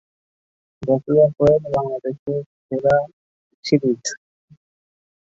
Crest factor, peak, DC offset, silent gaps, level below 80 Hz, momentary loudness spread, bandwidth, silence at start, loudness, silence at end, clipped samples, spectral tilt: 18 dB; -4 dBFS; under 0.1%; 2.19-2.26 s, 2.46-2.69 s, 3.13-3.63 s; -52 dBFS; 15 LU; 8 kHz; 0.8 s; -20 LUFS; 1.15 s; under 0.1%; -6 dB/octave